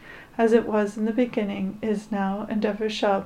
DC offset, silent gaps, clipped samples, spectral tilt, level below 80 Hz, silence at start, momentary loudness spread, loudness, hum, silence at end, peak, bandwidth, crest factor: under 0.1%; none; under 0.1%; -6.5 dB/octave; -54 dBFS; 0 s; 8 LU; -25 LUFS; none; 0 s; -6 dBFS; 11 kHz; 18 dB